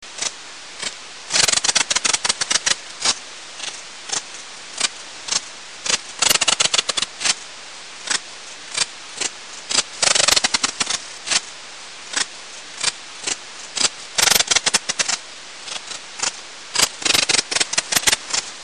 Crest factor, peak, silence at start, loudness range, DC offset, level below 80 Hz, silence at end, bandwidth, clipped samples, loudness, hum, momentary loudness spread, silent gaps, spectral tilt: 22 dB; 0 dBFS; 0 s; 4 LU; 0.5%; -56 dBFS; 0 s; 11 kHz; under 0.1%; -19 LUFS; none; 19 LU; none; 1 dB/octave